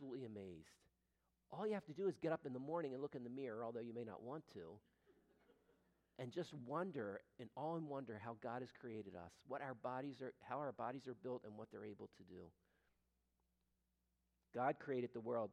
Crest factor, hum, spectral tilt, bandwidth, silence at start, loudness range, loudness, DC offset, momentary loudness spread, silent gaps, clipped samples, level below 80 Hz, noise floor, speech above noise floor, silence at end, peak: 22 dB; none; -7.5 dB/octave; 11.5 kHz; 0 s; 6 LU; -49 LUFS; under 0.1%; 14 LU; none; under 0.1%; -86 dBFS; -87 dBFS; 39 dB; 0 s; -26 dBFS